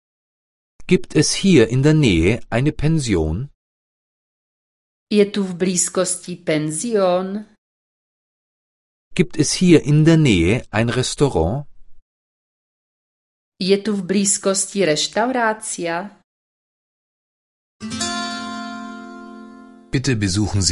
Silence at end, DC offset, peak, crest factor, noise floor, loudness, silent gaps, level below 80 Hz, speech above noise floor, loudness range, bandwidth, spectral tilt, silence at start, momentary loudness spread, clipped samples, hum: 0 s; under 0.1%; 0 dBFS; 20 dB; -41 dBFS; -18 LUFS; 3.54-5.07 s, 7.58-9.11 s, 12.02-13.52 s, 16.24-17.80 s; -38 dBFS; 24 dB; 9 LU; 11.5 kHz; -5 dB/octave; 0.8 s; 15 LU; under 0.1%; none